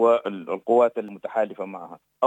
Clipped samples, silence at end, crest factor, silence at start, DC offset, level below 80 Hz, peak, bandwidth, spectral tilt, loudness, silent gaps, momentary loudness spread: under 0.1%; 0 s; 16 dB; 0 s; under 0.1%; -82 dBFS; -6 dBFS; 9 kHz; -7 dB/octave; -24 LUFS; none; 16 LU